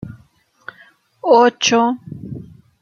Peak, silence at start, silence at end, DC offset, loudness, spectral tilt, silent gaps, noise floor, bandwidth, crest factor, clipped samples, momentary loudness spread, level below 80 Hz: -2 dBFS; 0.05 s; 0.4 s; under 0.1%; -15 LUFS; -3.5 dB/octave; none; -54 dBFS; 7.2 kHz; 18 dB; under 0.1%; 26 LU; -58 dBFS